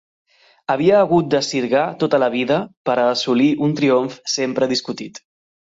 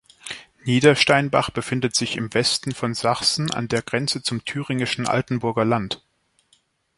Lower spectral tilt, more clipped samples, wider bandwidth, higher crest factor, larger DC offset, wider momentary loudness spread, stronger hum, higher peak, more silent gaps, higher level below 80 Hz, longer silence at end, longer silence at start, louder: about the same, -5 dB/octave vs -4 dB/octave; neither; second, 8 kHz vs 11.5 kHz; about the same, 16 dB vs 20 dB; neither; second, 8 LU vs 11 LU; neither; about the same, -4 dBFS vs -2 dBFS; first, 2.77-2.85 s vs none; second, -60 dBFS vs -54 dBFS; second, 0.5 s vs 1 s; first, 0.7 s vs 0.25 s; first, -18 LUFS vs -21 LUFS